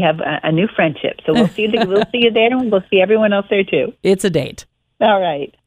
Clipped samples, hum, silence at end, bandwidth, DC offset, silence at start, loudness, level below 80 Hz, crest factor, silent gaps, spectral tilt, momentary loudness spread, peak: under 0.1%; none; 0.2 s; 14.5 kHz; under 0.1%; 0 s; -15 LUFS; -52 dBFS; 14 dB; none; -5.5 dB/octave; 5 LU; 0 dBFS